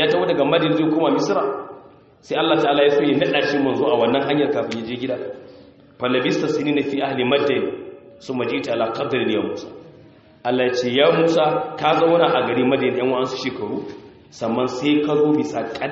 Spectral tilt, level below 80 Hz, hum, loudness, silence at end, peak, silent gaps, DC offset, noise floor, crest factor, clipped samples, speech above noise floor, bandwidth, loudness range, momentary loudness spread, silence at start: -3.5 dB/octave; -62 dBFS; none; -20 LUFS; 0 s; -4 dBFS; none; under 0.1%; -47 dBFS; 16 dB; under 0.1%; 28 dB; 7.4 kHz; 4 LU; 12 LU; 0 s